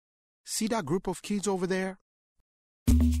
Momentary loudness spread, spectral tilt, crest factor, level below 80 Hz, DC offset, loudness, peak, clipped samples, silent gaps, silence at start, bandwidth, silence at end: 9 LU; -5.5 dB/octave; 18 dB; -34 dBFS; under 0.1%; -30 LUFS; -12 dBFS; under 0.1%; 2.01-2.86 s; 0.45 s; 15 kHz; 0 s